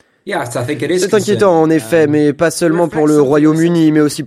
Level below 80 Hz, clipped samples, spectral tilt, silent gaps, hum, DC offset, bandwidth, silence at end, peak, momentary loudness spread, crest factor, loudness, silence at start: -54 dBFS; under 0.1%; -6 dB/octave; none; none; under 0.1%; 15 kHz; 0 s; 0 dBFS; 8 LU; 12 dB; -12 LUFS; 0.25 s